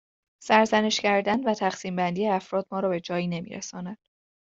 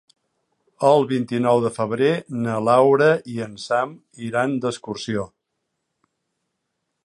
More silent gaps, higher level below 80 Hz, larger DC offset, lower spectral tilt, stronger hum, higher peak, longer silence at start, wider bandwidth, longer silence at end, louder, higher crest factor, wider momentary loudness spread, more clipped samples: neither; about the same, -68 dBFS vs -64 dBFS; neither; second, -4.5 dB/octave vs -6 dB/octave; neither; about the same, -4 dBFS vs -4 dBFS; second, 0.4 s vs 0.8 s; second, 8 kHz vs 11.5 kHz; second, 0.45 s vs 1.8 s; second, -25 LUFS vs -21 LUFS; about the same, 22 dB vs 18 dB; about the same, 15 LU vs 14 LU; neither